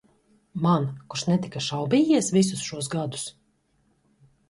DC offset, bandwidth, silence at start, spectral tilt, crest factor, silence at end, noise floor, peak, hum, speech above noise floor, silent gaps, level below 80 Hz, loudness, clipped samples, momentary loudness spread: under 0.1%; 11.5 kHz; 0.55 s; -5.5 dB/octave; 18 dB; 1.2 s; -67 dBFS; -8 dBFS; none; 43 dB; none; -64 dBFS; -25 LUFS; under 0.1%; 11 LU